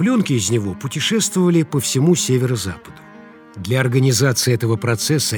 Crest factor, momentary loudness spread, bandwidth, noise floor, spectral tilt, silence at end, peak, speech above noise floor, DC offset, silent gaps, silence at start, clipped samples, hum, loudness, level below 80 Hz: 16 dB; 8 LU; over 20 kHz; -41 dBFS; -4.5 dB/octave; 0 s; -2 dBFS; 24 dB; under 0.1%; none; 0 s; under 0.1%; none; -17 LUFS; -54 dBFS